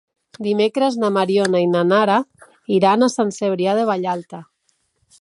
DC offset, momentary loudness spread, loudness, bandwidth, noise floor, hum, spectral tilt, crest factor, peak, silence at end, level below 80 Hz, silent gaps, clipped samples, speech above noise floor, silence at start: under 0.1%; 12 LU; -18 LUFS; 11.5 kHz; -67 dBFS; none; -5.5 dB/octave; 16 dB; -2 dBFS; 0.8 s; -68 dBFS; none; under 0.1%; 50 dB; 0.4 s